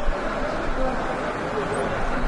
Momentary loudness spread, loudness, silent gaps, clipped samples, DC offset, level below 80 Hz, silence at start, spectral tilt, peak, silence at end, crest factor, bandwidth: 1 LU; -26 LUFS; none; under 0.1%; under 0.1%; -30 dBFS; 0 s; -5.5 dB/octave; -10 dBFS; 0 s; 14 dB; 11 kHz